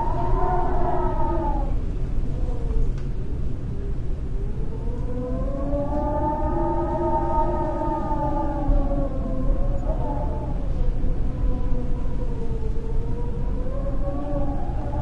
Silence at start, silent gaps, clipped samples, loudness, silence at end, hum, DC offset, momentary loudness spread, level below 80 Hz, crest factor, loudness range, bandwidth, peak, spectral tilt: 0 s; none; under 0.1%; -27 LUFS; 0 s; none; under 0.1%; 7 LU; -24 dBFS; 14 dB; 5 LU; 4.1 kHz; -8 dBFS; -9.5 dB/octave